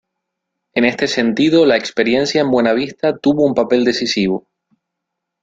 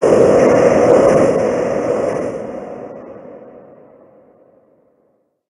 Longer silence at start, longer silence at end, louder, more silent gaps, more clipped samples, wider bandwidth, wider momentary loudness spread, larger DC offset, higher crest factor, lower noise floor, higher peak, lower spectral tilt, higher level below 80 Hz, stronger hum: first, 0.75 s vs 0 s; second, 1.05 s vs 1.9 s; about the same, -15 LUFS vs -13 LUFS; neither; neither; second, 7.8 kHz vs 11.5 kHz; second, 5 LU vs 22 LU; neither; about the same, 16 dB vs 16 dB; first, -78 dBFS vs -61 dBFS; about the same, 0 dBFS vs 0 dBFS; second, -5 dB/octave vs -6.5 dB/octave; second, -54 dBFS vs -46 dBFS; neither